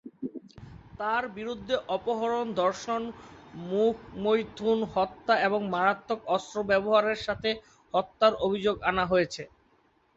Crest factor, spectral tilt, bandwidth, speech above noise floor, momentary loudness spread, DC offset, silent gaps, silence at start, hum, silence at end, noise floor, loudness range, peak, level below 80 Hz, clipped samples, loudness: 20 dB; -5 dB/octave; 8 kHz; 38 dB; 15 LU; under 0.1%; none; 0.05 s; none; 0.7 s; -66 dBFS; 4 LU; -8 dBFS; -58 dBFS; under 0.1%; -28 LUFS